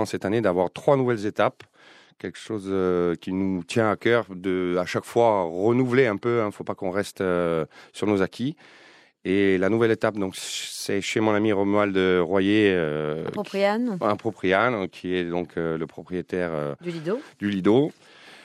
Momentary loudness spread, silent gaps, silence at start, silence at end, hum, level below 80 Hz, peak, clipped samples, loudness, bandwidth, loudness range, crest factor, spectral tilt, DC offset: 9 LU; none; 0 s; 0.1 s; none; -66 dBFS; -6 dBFS; under 0.1%; -24 LUFS; 14.5 kHz; 4 LU; 18 dB; -6 dB/octave; under 0.1%